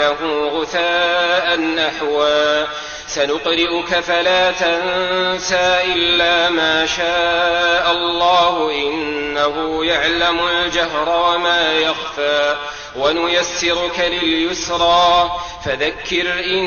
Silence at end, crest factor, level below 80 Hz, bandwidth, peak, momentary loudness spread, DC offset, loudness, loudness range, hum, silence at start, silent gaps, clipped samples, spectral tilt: 0 s; 12 dB; -44 dBFS; 7 kHz; -4 dBFS; 6 LU; under 0.1%; -16 LUFS; 2 LU; none; 0 s; none; under 0.1%; -2.5 dB/octave